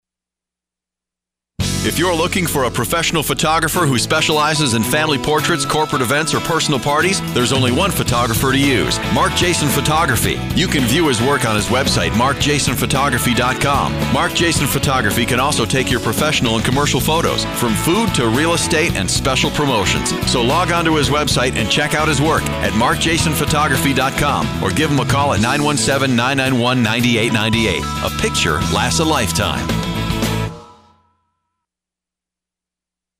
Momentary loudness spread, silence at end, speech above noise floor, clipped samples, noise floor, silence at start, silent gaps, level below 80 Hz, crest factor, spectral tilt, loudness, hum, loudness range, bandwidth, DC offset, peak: 3 LU; 2.5 s; 71 dB; under 0.1%; -86 dBFS; 1.6 s; none; -32 dBFS; 12 dB; -4 dB/octave; -15 LUFS; none; 3 LU; 16 kHz; under 0.1%; -4 dBFS